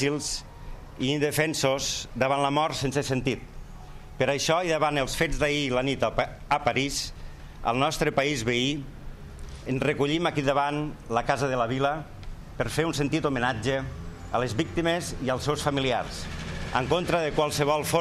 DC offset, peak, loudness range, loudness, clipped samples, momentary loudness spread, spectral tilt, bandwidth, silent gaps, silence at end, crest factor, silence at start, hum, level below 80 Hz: under 0.1%; -10 dBFS; 2 LU; -27 LUFS; under 0.1%; 17 LU; -4.5 dB/octave; 15.5 kHz; none; 0 s; 18 dB; 0 s; none; -42 dBFS